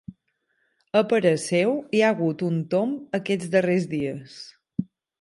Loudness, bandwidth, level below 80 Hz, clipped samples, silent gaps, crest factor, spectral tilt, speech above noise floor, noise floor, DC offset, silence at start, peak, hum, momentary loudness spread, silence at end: -24 LUFS; 11.5 kHz; -66 dBFS; under 0.1%; none; 18 dB; -6 dB/octave; 50 dB; -72 dBFS; under 0.1%; 0.1 s; -6 dBFS; none; 12 LU; 0.4 s